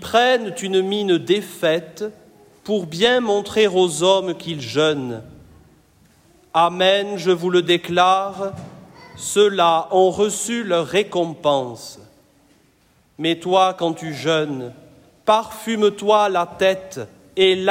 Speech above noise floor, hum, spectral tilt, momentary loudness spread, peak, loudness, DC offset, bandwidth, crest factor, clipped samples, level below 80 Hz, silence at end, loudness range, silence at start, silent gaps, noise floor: 39 dB; none; -4 dB/octave; 14 LU; -4 dBFS; -19 LUFS; under 0.1%; 16 kHz; 16 dB; under 0.1%; -60 dBFS; 0 s; 4 LU; 0 s; none; -58 dBFS